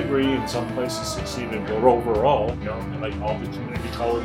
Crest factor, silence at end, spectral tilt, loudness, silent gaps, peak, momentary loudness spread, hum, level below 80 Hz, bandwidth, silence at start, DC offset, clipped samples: 20 dB; 0 s; -5.5 dB/octave; -24 LUFS; none; -4 dBFS; 10 LU; none; -38 dBFS; 16.5 kHz; 0 s; under 0.1%; under 0.1%